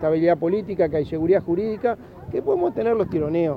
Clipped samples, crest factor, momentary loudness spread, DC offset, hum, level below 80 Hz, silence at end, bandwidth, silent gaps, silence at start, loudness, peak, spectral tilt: under 0.1%; 14 dB; 6 LU; under 0.1%; none; -50 dBFS; 0 s; 5.2 kHz; none; 0 s; -22 LUFS; -8 dBFS; -10 dB/octave